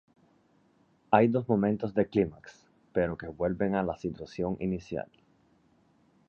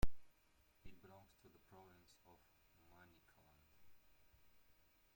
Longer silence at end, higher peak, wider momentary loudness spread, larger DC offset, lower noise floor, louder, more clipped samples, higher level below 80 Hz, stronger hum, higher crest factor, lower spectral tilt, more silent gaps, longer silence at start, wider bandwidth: first, 1.25 s vs 0.55 s; first, -6 dBFS vs -24 dBFS; first, 12 LU vs 4 LU; neither; second, -66 dBFS vs -75 dBFS; first, -30 LUFS vs -62 LUFS; neither; about the same, -56 dBFS vs -56 dBFS; neither; about the same, 26 dB vs 24 dB; first, -8.5 dB/octave vs -6 dB/octave; neither; first, 1.1 s vs 0.05 s; second, 7 kHz vs 16.5 kHz